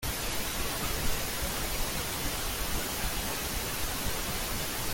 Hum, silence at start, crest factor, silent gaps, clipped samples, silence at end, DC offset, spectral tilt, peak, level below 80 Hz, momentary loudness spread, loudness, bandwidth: none; 0 s; 14 dB; none; under 0.1%; 0 s; under 0.1%; -2.5 dB/octave; -16 dBFS; -38 dBFS; 1 LU; -32 LUFS; 17 kHz